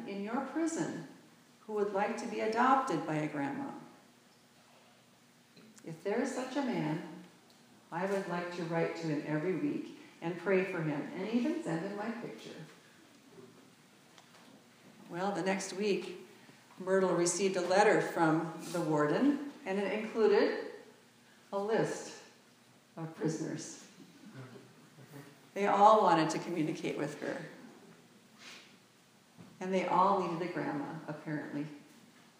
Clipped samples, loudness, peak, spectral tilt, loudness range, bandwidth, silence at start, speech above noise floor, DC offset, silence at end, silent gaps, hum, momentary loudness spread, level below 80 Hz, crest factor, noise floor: under 0.1%; -33 LUFS; -10 dBFS; -5 dB/octave; 11 LU; 15.5 kHz; 0 s; 31 dB; under 0.1%; 0.55 s; none; none; 23 LU; under -90 dBFS; 26 dB; -64 dBFS